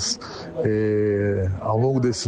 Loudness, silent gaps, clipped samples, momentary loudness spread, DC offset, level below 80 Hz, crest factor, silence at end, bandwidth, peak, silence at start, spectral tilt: -22 LUFS; none; under 0.1%; 6 LU; under 0.1%; -50 dBFS; 14 dB; 0 s; 9.6 kHz; -8 dBFS; 0 s; -5.5 dB/octave